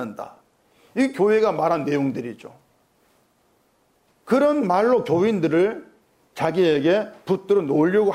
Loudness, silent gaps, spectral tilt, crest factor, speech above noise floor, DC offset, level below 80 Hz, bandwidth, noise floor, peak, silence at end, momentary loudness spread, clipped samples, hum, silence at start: -21 LUFS; none; -7 dB/octave; 14 dB; 43 dB; under 0.1%; -64 dBFS; 14 kHz; -63 dBFS; -8 dBFS; 0 s; 15 LU; under 0.1%; none; 0 s